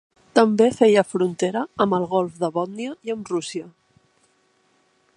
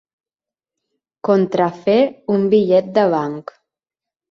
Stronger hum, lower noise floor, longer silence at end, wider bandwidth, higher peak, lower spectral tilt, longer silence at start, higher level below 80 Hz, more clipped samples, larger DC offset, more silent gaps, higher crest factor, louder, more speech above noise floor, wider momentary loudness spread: neither; second, -63 dBFS vs under -90 dBFS; first, 1.45 s vs 0.9 s; first, 11 kHz vs 6.6 kHz; about the same, 0 dBFS vs -2 dBFS; second, -5.5 dB/octave vs -8 dB/octave; second, 0.35 s vs 1.25 s; about the same, -66 dBFS vs -62 dBFS; neither; neither; neither; first, 22 dB vs 16 dB; second, -21 LUFS vs -17 LUFS; second, 43 dB vs over 74 dB; first, 13 LU vs 10 LU